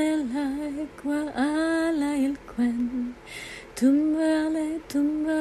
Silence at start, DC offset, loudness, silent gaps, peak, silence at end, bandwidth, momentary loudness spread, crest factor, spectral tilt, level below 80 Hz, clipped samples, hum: 0 s; under 0.1%; -26 LUFS; none; -10 dBFS; 0 s; 13 kHz; 10 LU; 14 dB; -4.5 dB/octave; -54 dBFS; under 0.1%; none